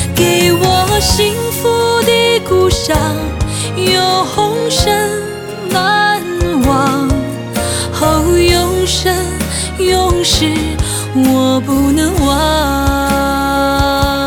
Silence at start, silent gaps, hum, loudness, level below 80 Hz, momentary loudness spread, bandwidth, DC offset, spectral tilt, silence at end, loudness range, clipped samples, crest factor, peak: 0 s; none; none; -12 LUFS; -24 dBFS; 7 LU; over 20 kHz; under 0.1%; -4 dB/octave; 0 s; 2 LU; under 0.1%; 12 dB; 0 dBFS